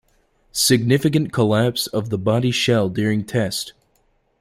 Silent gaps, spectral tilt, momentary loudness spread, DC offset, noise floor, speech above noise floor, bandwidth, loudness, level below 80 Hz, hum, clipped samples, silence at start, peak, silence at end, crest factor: none; -5 dB/octave; 7 LU; under 0.1%; -63 dBFS; 44 dB; 16.5 kHz; -19 LUFS; -52 dBFS; none; under 0.1%; 0.55 s; -2 dBFS; 0.7 s; 18 dB